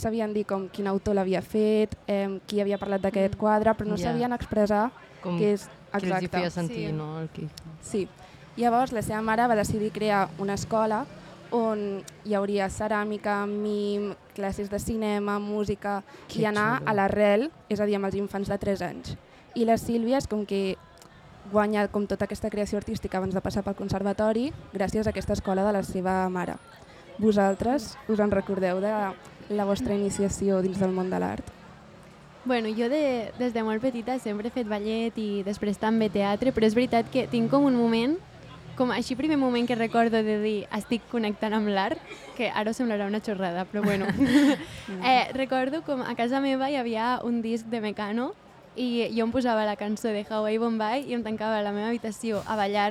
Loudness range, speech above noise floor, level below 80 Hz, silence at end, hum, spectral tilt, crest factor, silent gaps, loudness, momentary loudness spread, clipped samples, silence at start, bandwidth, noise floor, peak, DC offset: 4 LU; 24 dB; -52 dBFS; 0 s; none; -6 dB/octave; 18 dB; none; -27 LUFS; 9 LU; under 0.1%; 0 s; 14.5 kHz; -50 dBFS; -10 dBFS; under 0.1%